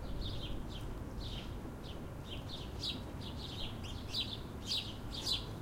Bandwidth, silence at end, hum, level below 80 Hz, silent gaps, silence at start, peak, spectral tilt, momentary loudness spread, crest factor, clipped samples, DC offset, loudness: 16 kHz; 0 s; none; -48 dBFS; none; 0 s; -24 dBFS; -4.5 dB/octave; 9 LU; 18 dB; under 0.1%; under 0.1%; -42 LUFS